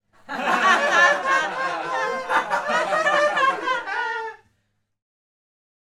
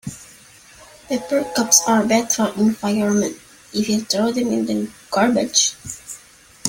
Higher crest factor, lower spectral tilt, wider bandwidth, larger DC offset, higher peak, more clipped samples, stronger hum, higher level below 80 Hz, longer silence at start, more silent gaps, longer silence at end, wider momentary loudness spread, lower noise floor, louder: about the same, 18 dB vs 20 dB; about the same, -2 dB/octave vs -3 dB/octave; second, 15 kHz vs 17 kHz; neither; second, -4 dBFS vs 0 dBFS; neither; neither; second, -68 dBFS vs -56 dBFS; first, 0.3 s vs 0.05 s; neither; first, 1.65 s vs 0 s; second, 11 LU vs 19 LU; first, -71 dBFS vs -47 dBFS; second, -21 LUFS vs -18 LUFS